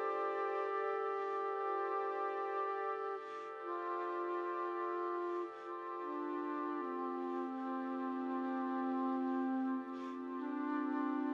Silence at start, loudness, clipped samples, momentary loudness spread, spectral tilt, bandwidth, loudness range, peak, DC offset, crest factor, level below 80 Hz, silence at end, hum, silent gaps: 0 s; -40 LUFS; under 0.1%; 6 LU; -6 dB/octave; 6.6 kHz; 2 LU; -26 dBFS; under 0.1%; 12 dB; under -90 dBFS; 0 s; none; none